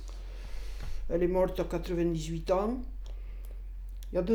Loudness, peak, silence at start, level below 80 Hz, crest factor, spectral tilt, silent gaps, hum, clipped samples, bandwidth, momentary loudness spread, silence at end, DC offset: -32 LUFS; -16 dBFS; 0 s; -38 dBFS; 16 dB; -7 dB/octave; none; none; under 0.1%; 17.5 kHz; 16 LU; 0 s; under 0.1%